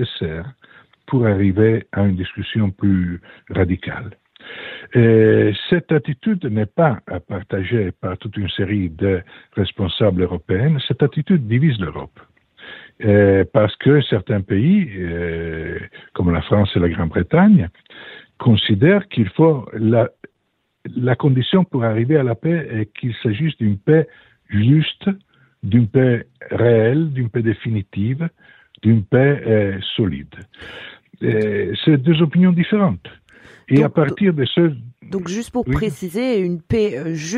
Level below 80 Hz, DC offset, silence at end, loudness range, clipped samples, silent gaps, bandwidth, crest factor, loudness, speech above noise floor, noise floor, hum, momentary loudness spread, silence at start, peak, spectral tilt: -44 dBFS; under 0.1%; 0 s; 3 LU; under 0.1%; none; 10.5 kHz; 16 dB; -18 LUFS; 52 dB; -69 dBFS; none; 14 LU; 0 s; -2 dBFS; -8 dB/octave